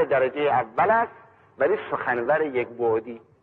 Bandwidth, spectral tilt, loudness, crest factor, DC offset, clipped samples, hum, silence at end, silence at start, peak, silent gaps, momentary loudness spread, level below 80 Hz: 4.3 kHz; -8.5 dB/octave; -24 LUFS; 16 dB; under 0.1%; under 0.1%; none; 0.25 s; 0 s; -8 dBFS; none; 6 LU; -66 dBFS